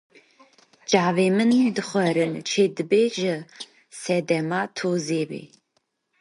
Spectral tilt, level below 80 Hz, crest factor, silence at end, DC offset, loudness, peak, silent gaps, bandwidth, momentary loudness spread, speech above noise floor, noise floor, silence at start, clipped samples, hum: -5 dB/octave; -72 dBFS; 20 dB; 0.75 s; under 0.1%; -23 LUFS; -4 dBFS; none; 11.5 kHz; 16 LU; 50 dB; -72 dBFS; 0.9 s; under 0.1%; none